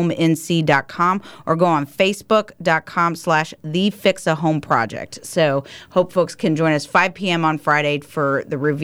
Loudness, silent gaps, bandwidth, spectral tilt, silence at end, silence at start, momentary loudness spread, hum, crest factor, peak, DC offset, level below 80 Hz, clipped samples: -19 LUFS; none; 16 kHz; -5.5 dB/octave; 0 s; 0 s; 5 LU; none; 16 dB; -2 dBFS; under 0.1%; -58 dBFS; under 0.1%